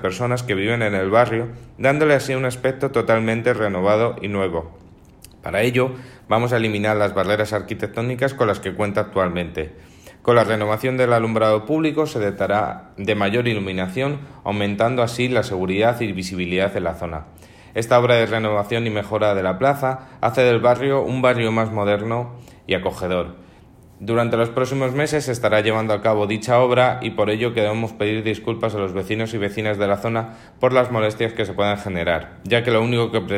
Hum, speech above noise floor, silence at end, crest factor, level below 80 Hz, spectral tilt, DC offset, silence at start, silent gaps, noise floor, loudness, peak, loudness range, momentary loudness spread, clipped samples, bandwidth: none; 27 dB; 0 s; 16 dB; -50 dBFS; -6 dB/octave; under 0.1%; 0 s; none; -47 dBFS; -20 LUFS; -4 dBFS; 3 LU; 8 LU; under 0.1%; 16 kHz